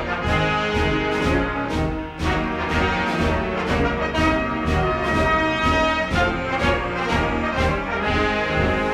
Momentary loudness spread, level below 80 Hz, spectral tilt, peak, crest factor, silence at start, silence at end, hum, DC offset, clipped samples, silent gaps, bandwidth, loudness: 4 LU; -30 dBFS; -6 dB/octave; -6 dBFS; 14 dB; 0 s; 0 s; none; under 0.1%; under 0.1%; none; 13 kHz; -21 LUFS